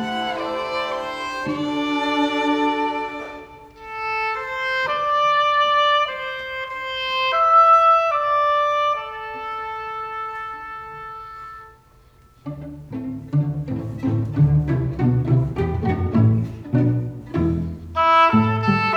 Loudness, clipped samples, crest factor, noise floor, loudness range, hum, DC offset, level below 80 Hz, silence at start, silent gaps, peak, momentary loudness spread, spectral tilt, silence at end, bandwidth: -20 LUFS; under 0.1%; 18 dB; -51 dBFS; 13 LU; none; under 0.1%; -42 dBFS; 0 s; none; -4 dBFS; 18 LU; -7 dB/octave; 0 s; 9.2 kHz